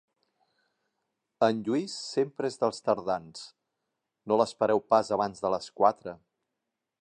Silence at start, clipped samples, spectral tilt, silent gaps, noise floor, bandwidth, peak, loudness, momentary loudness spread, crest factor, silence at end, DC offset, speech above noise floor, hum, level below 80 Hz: 1.4 s; under 0.1%; -5 dB/octave; none; -85 dBFS; 10.5 kHz; -8 dBFS; -28 LUFS; 13 LU; 22 dB; 0.85 s; under 0.1%; 57 dB; none; -70 dBFS